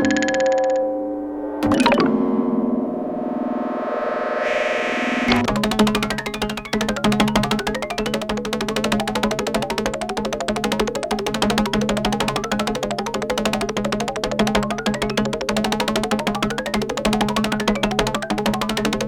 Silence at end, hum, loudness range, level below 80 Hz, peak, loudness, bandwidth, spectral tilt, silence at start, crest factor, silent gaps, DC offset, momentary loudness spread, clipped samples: 0 s; none; 2 LU; -40 dBFS; -2 dBFS; -21 LUFS; 18 kHz; -4.5 dB/octave; 0 s; 18 dB; none; under 0.1%; 6 LU; under 0.1%